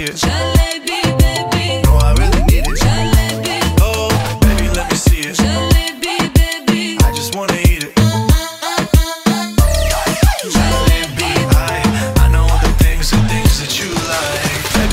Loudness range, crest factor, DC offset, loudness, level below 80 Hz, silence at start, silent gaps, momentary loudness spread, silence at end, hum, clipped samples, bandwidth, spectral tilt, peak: 1 LU; 12 dB; under 0.1%; -14 LUFS; -16 dBFS; 0 s; none; 4 LU; 0 s; none; under 0.1%; 16.5 kHz; -4.5 dB/octave; 0 dBFS